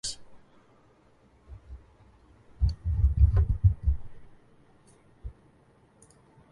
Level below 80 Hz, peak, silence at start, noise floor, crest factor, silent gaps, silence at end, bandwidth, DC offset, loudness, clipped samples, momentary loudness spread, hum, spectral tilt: -32 dBFS; -10 dBFS; 0.05 s; -61 dBFS; 20 dB; none; 1.2 s; 11.5 kHz; under 0.1%; -27 LUFS; under 0.1%; 27 LU; none; -5.5 dB/octave